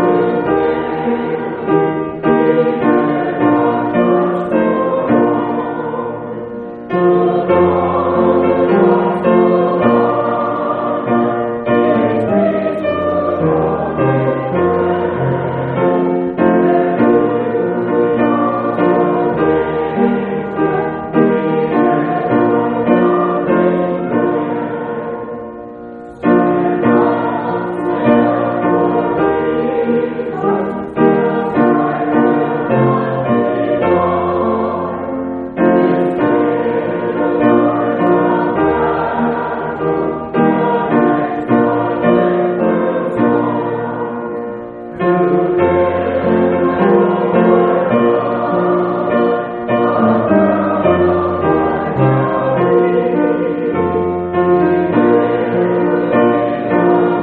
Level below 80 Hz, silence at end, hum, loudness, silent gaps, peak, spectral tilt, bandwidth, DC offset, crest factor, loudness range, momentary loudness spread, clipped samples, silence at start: -46 dBFS; 0 s; none; -14 LUFS; none; 0 dBFS; -7 dB/octave; 4.4 kHz; under 0.1%; 14 dB; 3 LU; 6 LU; under 0.1%; 0 s